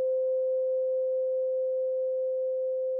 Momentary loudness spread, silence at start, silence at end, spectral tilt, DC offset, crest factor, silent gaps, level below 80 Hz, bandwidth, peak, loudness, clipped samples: 2 LU; 0 s; 0 s; 9 dB/octave; under 0.1%; 4 dB; none; under -90 dBFS; 1.1 kHz; -24 dBFS; -29 LUFS; under 0.1%